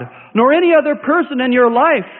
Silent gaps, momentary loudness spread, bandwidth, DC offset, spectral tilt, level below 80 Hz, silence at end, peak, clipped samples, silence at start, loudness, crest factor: none; 5 LU; 4.1 kHz; under 0.1%; -11 dB/octave; -64 dBFS; 0 s; 0 dBFS; under 0.1%; 0 s; -13 LUFS; 12 dB